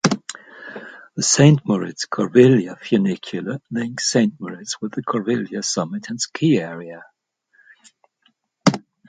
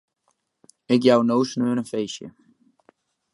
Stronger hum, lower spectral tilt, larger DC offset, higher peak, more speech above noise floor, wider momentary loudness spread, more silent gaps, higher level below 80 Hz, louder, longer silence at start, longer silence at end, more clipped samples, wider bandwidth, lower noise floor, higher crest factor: neither; about the same, -5 dB/octave vs -6 dB/octave; neither; first, 0 dBFS vs -4 dBFS; second, 46 dB vs 51 dB; first, 21 LU vs 16 LU; neither; first, -60 dBFS vs -72 dBFS; about the same, -19 LUFS vs -21 LUFS; second, 0.05 s vs 0.9 s; second, 0.3 s vs 1.05 s; neither; second, 9.4 kHz vs 11.5 kHz; second, -65 dBFS vs -72 dBFS; about the same, 20 dB vs 20 dB